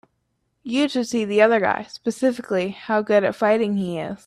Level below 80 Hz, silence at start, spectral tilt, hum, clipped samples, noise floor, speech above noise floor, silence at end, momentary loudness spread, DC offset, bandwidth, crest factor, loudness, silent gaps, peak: -64 dBFS; 0.65 s; -5.5 dB/octave; none; under 0.1%; -72 dBFS; 51 dB; 0.1 s; 9 LU; under 0.1%; 13 kHz; 18 dB; -21 LUFS; none; -2 dBFS